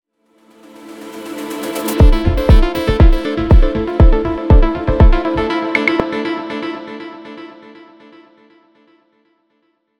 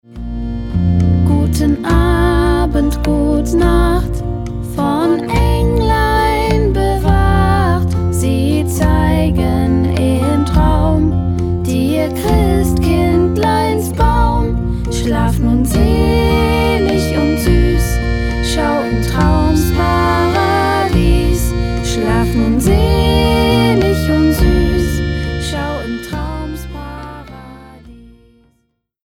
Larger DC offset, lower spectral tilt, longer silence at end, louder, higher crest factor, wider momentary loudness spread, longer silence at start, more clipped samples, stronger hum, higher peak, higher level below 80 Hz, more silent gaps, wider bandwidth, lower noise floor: neither; about the same, -7 dB/octave vs -6.5 dB/octave; first, 2.5 s vs 1.1 s; about the same, -15 LUFS vs -14 LUFS; about the same, 14 dB vs 12 dB; first, 19 LU vs 8 LU; first, 0.85 s vs 0.1 s; neither; neither; about the same, 0 dBFS vs 0 dBFS; about the same, -16 dBFS vs -18 dBFS; neither; about the same, 17.5 kHz vs 17 kHz; about the same, -63 dBFS vs -64 dBFS